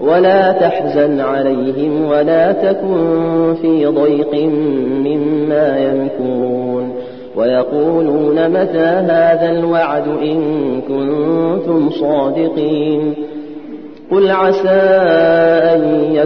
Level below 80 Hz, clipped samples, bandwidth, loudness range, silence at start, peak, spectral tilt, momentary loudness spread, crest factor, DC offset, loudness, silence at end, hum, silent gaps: -54 dBFS; under 0.1%; 5.8 kHz; 3 LU; 0 s; 0 dBFS; -9 dB/octave; 7 LU; 12 dB; 0.7%; -13 LUFS; 0 s; none; none